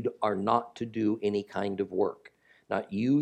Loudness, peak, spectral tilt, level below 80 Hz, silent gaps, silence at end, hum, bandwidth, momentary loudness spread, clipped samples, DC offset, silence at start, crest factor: -30 LUFS; -10 dBFS; -7.5 dB/octave; -74 dBFS; none; 0 s; none; 9.2 kHz; 7 LU; under 0.1%; under 0.1%; 0 s; 20 dB